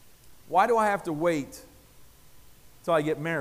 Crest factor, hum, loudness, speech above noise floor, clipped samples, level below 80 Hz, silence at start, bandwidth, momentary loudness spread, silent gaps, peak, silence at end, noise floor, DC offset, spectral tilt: 20 dB; none; -26 LUFS; 28 dB; under 0.1%; -60 dBFS; 0.25 s; 15.5 kHz; 15 LU; none; -10 dBFS; 0 s; -53 dBFS; under 0.1%; -5.5 dB/octave